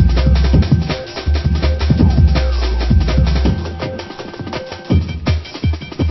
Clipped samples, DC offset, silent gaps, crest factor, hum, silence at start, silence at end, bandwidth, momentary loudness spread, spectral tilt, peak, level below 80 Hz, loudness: under 0.1%; under 0.1%; none; 14 dB; none; 0 s; 0 s; 6 kHz; 12 LU; -7.5 dB/octave; 0 dBFS; -16 dBFS; -16 LUFS